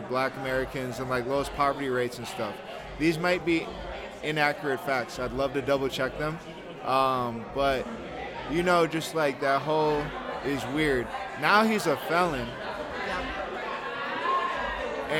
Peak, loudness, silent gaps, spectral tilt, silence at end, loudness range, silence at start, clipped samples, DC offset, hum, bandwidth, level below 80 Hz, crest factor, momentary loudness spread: -8 dBFS; -28 LUFS; none; -5 dB/octave; 0 s; 3 LU; 0 s; under 0.1%; under 0.1%; none; 18 kHz; -50 dBFS; 22 dB; 10 LU